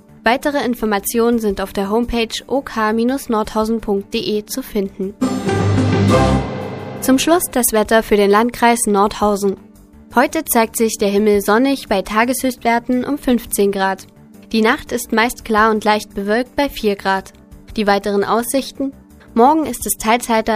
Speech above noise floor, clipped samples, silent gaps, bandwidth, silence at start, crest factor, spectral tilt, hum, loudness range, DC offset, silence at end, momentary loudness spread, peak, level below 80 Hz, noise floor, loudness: 25 dB; under 0.1%; none; 15.5 kHz; 0.25 s; 16 dB; -4.5 dB/octave; none; 4 LU; under 0.1%; 0 s; 8 LU; 0 dBFS; -38 dBFS; -41 dBFS; -16 LUFS